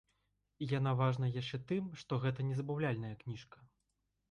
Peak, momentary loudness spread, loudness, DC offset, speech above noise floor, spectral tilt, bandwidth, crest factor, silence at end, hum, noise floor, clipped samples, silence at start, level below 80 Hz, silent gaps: -22 dBFS; 12 LU; -38 LUFS; under 0.1%; 47 dB; -8 dB/octave; 7.2 kHz; 16 dB; 0.65 s; none; -84 dBFS; under 0.1%; 0.6 s; -68 dBFS; none